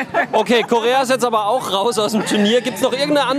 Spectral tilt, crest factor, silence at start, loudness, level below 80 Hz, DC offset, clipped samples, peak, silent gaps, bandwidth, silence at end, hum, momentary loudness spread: -3.5 dB/octave; 14 dB; 0 s; -16 LUFS; -62 dBFS; under 0.1%; under 0.1%; -4 dBFS; none; 15.5 kHz; 0 s; none; 3 LU